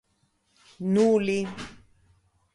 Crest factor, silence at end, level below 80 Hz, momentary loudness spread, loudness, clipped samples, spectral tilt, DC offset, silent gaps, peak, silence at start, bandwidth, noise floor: 16 dB; 0.8 s; -62 dBFS; 19 LU; -25 LUFS; under 0.1%; -6.5 dB/octave; under 0.1%; none; -12 dBFS; 0.8 s; 11.5 kHz; -70 dBFS